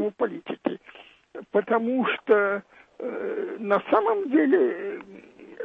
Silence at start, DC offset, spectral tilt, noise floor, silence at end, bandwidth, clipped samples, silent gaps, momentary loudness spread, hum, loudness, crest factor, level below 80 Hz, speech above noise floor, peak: 0 s; under 0.1%; -8 dB/octave; -44 dBFS; 0 s; 4.4 kHz; under 0.1%; none; 14 LU; none; -25 LUFS; 18 dB; -72 dBFS; 20 dB; -8 dBFS